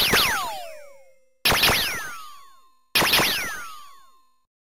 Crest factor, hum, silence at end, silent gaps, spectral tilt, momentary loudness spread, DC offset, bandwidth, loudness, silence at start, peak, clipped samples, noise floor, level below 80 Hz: 20 dB; none; 0.9 s; none; -1.5 dB/octave; 19 LU; 0.5%; 16 kHz; -20 LUFS; 0 s; -6 dBFS; under 0.1%; -56 dBFS; -46 dBFS